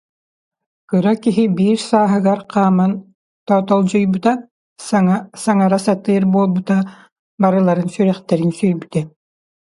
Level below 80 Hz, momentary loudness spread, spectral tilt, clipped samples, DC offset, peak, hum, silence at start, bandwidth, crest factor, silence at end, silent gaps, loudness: -60 dBFS; 7 LU; -7.5 dB/octave; under 0.1%; under 0.1%; 0 dBFS; none; 0.9 s; 11.5 kHz; 16 dB; 0.55 s; 3.15-3.46 s, 4.51-4.76 s, 7.12-7.38 s; -16 LUFS